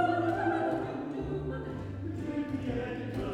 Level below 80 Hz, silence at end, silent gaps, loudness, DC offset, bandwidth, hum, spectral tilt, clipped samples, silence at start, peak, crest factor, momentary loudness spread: -50 dBFS; 0 s; none; -34 LUFS; under 0.1%; 10.5 kHz; none; -8 dB/octave; under 0.1%; 0 s; -16 dBFS; 16 dB; 9 LU